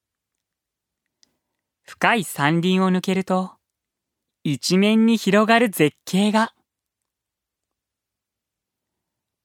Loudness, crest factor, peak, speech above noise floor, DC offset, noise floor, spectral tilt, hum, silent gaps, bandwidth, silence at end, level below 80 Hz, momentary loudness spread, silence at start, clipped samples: -19 LUFS; 22 dB; 0 dBFS; 66 dB; under 0.1%; -85 dBFS; -5.5 dB/octave; none; none; 17 kHz; 2.95 s; -72 dBFS; 8 LU; 1.9 s; under 0.1%